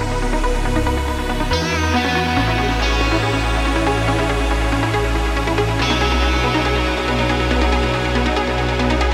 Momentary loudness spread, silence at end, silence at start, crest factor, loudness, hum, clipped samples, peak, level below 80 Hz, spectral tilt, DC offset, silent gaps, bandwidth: 3 LU; 0 s; 0 s; 14 dB; -18 LUFS; none; under 0.1%; -4 dBFS; -22 dBFS; -5 dB/octave; under 0.1%; none; 14.5 kHz